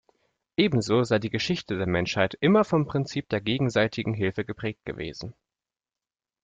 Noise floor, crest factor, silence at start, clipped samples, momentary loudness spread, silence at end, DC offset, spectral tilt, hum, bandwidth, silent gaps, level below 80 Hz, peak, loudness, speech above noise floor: under -90 dBFS; 20 dB; 0.6 s; under 0.1%; 13 LU; 1.1 s; under 0.1%; -6 dB/octave; none; 9.2 kHz; none; -56 dBFS; -8 dBFS; -26 LUFS; over 65 dB